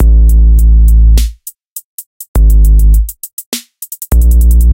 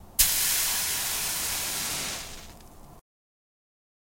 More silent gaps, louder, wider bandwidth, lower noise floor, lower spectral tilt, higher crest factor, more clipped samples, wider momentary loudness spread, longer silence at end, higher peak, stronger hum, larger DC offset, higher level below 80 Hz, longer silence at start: first, 1.67-1.76 s, 1.84-1.98 s, 2.06-2.20 s, 2.28-2.34 s, 3.33-3.37 s, 3.46-3.52 s vs none; first, -10 LUFS vs -25 LUFS; about the same, 17 kHz vs 16.5 kHz; second, -29 dBFS vs -48 dBFS; first, -6 dB/octave vs 0.5 dB/octave; second, 6 dB vs 26 dB; first, 0.2% vs under 0.1%; first, 18 LU vs 14 LU; second, 0 s vs 1 s; first, 0 dBFS vs -4 dBFS; neither; neither; first, -6 dBFS vs -48 dBFS; about the same, 0 s vs 0 s